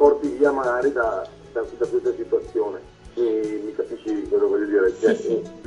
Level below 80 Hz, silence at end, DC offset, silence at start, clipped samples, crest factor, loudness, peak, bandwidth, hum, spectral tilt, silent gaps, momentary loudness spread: -52 dBFS; 0.05 s; under 0.1%; 0 s; under 0.1%; 18 dB; -23 LUFS; -4 dBFS; 10 kHz; none; -6 dB/octave; none; 10 LU